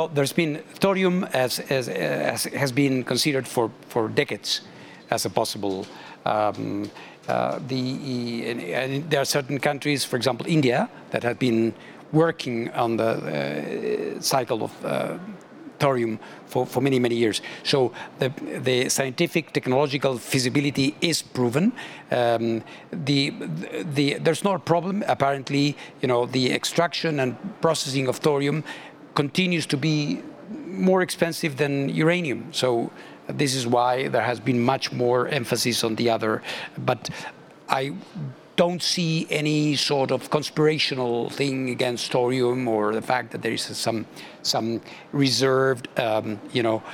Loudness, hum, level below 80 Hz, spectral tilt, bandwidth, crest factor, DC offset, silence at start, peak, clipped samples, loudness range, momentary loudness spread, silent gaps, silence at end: -24 LUFS; none; -70 dBFS; -4.5 dB/octave; 18 kHz; 22 dB; under 0.1%; 0 s; -2 dBFS; under 0.1%; 3 LU; 8 LU; none; 0 s